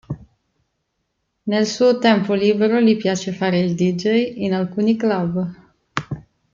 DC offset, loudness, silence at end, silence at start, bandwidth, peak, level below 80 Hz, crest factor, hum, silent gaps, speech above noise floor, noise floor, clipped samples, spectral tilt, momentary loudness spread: under 0.1%; -19 LUFS; 0.35 s; 0.1 s; 7.6 kHz; -2 dBFS; -56 dBFS; 18 dB; none; none; 55 dB; -73 dBFS; under 0.1%; -6 dB/octave; 14 LU